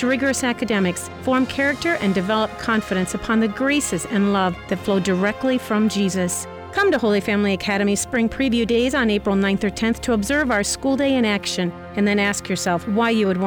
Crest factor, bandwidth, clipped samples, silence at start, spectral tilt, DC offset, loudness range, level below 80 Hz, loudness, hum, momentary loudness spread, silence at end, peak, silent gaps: 10 dB; over 20 kHz; under 0.1%; 0 s; -4.5 dB/octave; under 0.1%; 1 LU; -44 dBFS; -20 LUFS; none; 4 LU; 0 s; -10 dBFS; none